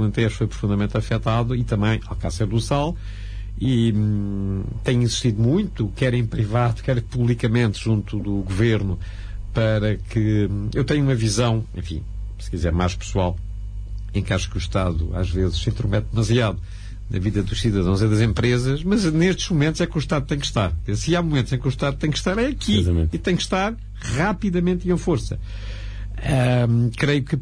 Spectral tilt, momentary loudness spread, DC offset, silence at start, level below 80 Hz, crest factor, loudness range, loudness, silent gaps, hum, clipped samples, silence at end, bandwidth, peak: -6 dB/octave; 11 LU; under 0.1%; 0 s; -32 dBFS; 14 dB; 3 LU; -22 LUFS; none; 50 Hz at -35 dBFS; under 0.1%; 0 s; 10.5 kHz; -8 dBFS